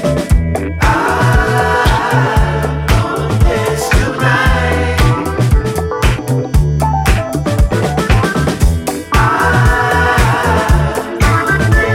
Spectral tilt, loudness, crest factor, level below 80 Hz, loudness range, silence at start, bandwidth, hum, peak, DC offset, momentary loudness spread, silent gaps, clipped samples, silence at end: -5.5 dB/octave; -13 LUFS; 12 dB; -18 dBFS; 2 LU; 0 s; 16.5 kHz; none; 0 dBFS; under 0.1%; 4 LU; none; under 0.1%; 0 s